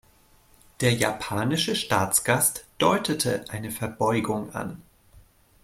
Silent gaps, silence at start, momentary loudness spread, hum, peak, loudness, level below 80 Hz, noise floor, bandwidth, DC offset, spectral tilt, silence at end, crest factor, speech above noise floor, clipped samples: none; 0.8 s; 11 LU; none; -6 dBFS; -25 LUFS; -56 dBFS; -58 dBFS; 16.5 kHz; under 0.1%; -3.5 dB/octave; 0.45 s; 20 dB; 33 dB; under 0.1%